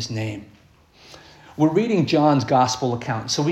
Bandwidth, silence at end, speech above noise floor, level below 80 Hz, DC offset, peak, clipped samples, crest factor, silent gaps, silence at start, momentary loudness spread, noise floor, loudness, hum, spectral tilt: 13 kHz; 0 s; 33 dB; -58 dBFS; under 0.1%; -4 dBFS; under 0.1%; 16 dB; none; 0 s; 13 LU; -53 dBFS; -20 LUFS; none; -5.5 dB/octave